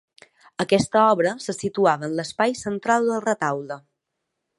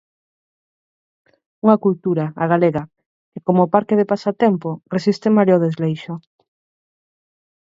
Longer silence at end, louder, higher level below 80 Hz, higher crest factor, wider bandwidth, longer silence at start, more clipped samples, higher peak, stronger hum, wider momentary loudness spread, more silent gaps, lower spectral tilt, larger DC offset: second, 0.8 s vs 1.55 s; second, -22 LUFS vs -18 LUFS; about the same, -60 dBFS vs -62 dBFS; about the same, 18 dB vs 20 dB; first, 11.5 kHz vs 7.6 kHz; second, 0.6 s vs 1.65 s; neither; second, -4 dBFS vs 0 dBFS; neither; about the same, 12 LU vs 10 LU; second, none vs 3.06-3.32 s; second, -5 dB/octave vs -8.5 dB/octave; neither